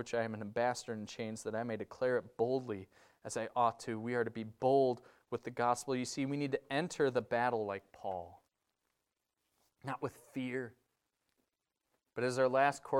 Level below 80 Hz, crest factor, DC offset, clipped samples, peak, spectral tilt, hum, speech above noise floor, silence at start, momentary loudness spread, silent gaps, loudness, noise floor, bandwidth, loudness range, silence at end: -76 dBFS; 20 dB; under 0.1%; under 0.1%; -16 dBFS; -5 dB/octave; none; 51 dB; 0 s; 13 LU; none; -37 LUFS; -87 dBFS; 15.5 kHz; 11 LU; 0 s